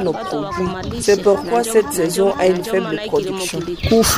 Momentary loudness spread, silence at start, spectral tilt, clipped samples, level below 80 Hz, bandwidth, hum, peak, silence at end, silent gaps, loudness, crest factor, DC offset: 8 LU; 0 s; -4 dB/octave; under 0.1%; -38 dBFS; 16 kHz; none; -2 dBFS; 0 s; none; -18 LUFS; 14 dB; under 0.1%